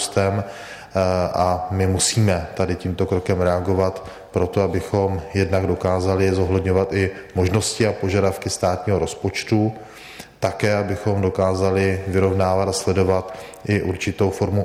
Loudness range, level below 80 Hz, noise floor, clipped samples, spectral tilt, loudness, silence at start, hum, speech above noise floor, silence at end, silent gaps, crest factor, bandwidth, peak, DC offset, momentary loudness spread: 2 LU; -44 dBFS; -40 dBFS; under 0.1%; -5.5 dB/octave; -21 LUFS; 0 s; none; 20 dB; 0 s; none; 16 dB; 15 kHz; -4 dBFS; under 0.1%; 6 LU